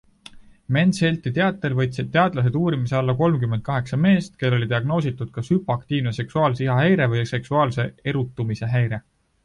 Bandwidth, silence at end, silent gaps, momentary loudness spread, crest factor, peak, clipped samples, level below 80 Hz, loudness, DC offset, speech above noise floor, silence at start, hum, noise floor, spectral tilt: 11 kHz; 0.45 s; none; 7 LU; 18 dB; -4 dBFS; under 0.1%; -52 dBFS; -22 LUFS; under 0.1%; 25 dB; 0.35 s; none; -45 dBFS; -7.5 dB/octave